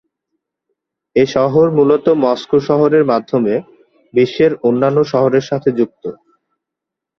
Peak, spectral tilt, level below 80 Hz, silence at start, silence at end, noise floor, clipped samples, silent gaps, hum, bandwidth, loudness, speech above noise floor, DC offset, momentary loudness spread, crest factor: 0 dBFS; -7.5 dB/octave; -54 dBFS; 1.15 s; 1.05 s; -82 dBFS; under 0.1%; none; none; 6.6 kHz; -14 LUFS; 69 dB; under 0.1%; 8 LU; 14 dB